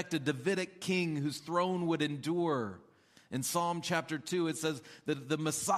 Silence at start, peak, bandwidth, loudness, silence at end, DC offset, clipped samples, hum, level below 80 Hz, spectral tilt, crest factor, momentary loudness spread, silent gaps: 0 s; -16 dBFS; 15 kHz; -34 LUFS; 0 s; under 0.1%; under 0.1%; none; -76 dBFS; -4.5 dB/octave; 18 dB; 6 LU; none